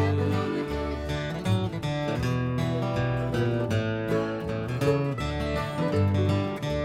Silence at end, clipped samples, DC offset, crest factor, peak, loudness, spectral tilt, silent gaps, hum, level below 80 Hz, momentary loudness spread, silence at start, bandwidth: 0 s; under 0.1%; under 0.1%; 14 dB; -12 dBFS; -28 LUFS; -7 dB/octave; none; none; -42 dBFS; 5 LU; 0 s; 14.5 kHz